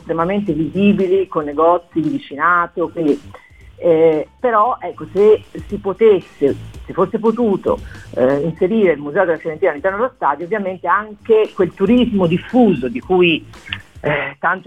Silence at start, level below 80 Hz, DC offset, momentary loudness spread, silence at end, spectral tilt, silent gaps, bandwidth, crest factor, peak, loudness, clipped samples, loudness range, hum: 0.05 s; -44 dBFS; 0.2%; 9 LU; 0.05 s; -8 dB/octave; none; 9 kHz; 14 dB; -2 dBFS; -16 LUFS; under 0.1%; 2 LU; none